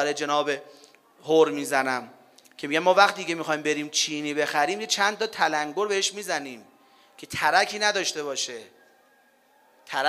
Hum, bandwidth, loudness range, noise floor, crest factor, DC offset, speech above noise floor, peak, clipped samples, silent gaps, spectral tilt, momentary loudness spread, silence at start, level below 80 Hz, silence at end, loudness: none; 15.5 kHz; 4 LU; -61 dBFS; 24 dB; under 0.1%; 36 dB; -2 dBFS; under 0.1%; none; -2 dB/octave; 11 LU; 0 s; -72 dBFS; 0 s; -24 LUFS